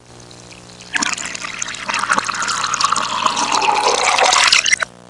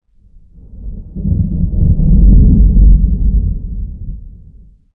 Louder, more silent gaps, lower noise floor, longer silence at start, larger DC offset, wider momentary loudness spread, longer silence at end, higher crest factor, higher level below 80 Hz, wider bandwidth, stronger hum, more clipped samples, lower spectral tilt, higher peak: second, -15 LUFS vs -12 LUFS; neither; about the same, -39 dBFS vs -42 dBFS; second, 0.1 s vs 0.75 s; first, 0.2% vs under 0.1%; second, 13 LU vs 21 LU; second, 0.2 s vs 0.65 s; first, 18 dB vs 10 dB; second, -54 dBFS vs -12 dBFS; first, 11.5 kHz vs 0.8 kHz; first, 60 Hz at -45 dBFS vs none; neither; second, 0 dB/octave vs -16.5 dB/octave; about the same, 0 dBFS vs 0 dBFS